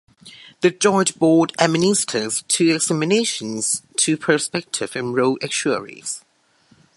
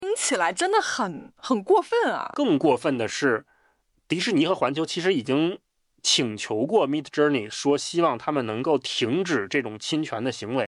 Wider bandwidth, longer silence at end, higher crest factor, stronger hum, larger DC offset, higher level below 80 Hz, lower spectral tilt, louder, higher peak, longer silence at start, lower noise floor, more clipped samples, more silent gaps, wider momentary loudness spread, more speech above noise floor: about the same, 11.5 kHz vs 12 kHz; first, 0.8 s vs 0 s; about the same, 20 dB vs 16 dB; neither; neither; first, -64 dBFS vs -70 dBFS; about the same, -3.5 dB/octave vs -3.5 dB/octave; first, -19 LUFS vs -24 LUFS; first, 0 dBFS vs -8 dBFS; first, 0.25 s vs 0 s; second, -58 dBFS vs -66 dBFS; neither; neither; about the same, 8 LU vs 6 LU; second, 38 dB vs 43 dB